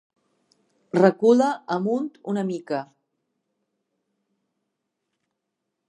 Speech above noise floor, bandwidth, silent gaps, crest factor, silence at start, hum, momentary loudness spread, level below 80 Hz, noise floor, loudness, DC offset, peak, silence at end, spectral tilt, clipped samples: 59 dB; 10.5 kHz; none; 24 dB; 0.95 s; none; 11 LU; -78 dBFS; -81 dBFS; -22 LUFS; under 0.1%; -2 dBFS; 3.05 s; -7 dB/octave; under 0.1%